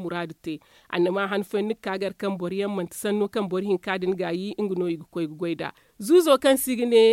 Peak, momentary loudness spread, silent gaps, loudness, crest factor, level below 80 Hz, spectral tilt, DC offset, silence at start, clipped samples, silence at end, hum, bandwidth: -6 dBFS; 13 LU; none; -25 LUFS; 18 dB; -66 dBFS; -5 dB/octave; under 0.1%; 0 s; under 0.1%; 0 s; none; 16.5 kHz